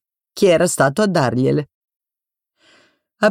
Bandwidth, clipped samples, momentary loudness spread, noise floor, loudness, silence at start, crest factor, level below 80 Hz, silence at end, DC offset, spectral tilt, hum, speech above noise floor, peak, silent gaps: 16 kHz; under 0.1%; 12 LU; -88 dBFS; -17 LUFS; 0.35 s; 16 dB; -56 dBFS; 0 s; under 0.1%; -5 dB/octave; none; 72 dB; -4 dBFS; 1.74-1.81 s, 1.96-2.00 s